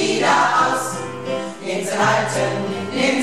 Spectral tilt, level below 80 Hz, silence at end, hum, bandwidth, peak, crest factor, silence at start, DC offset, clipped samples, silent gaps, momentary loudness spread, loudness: -3.5 dB/octave; -62 dBFS; 0 s; none; 14.5 kHz; -4 dBFS; 14 dB; 0 s; 0.6%; under 0.1%; none; 11 LU; -19 LUFS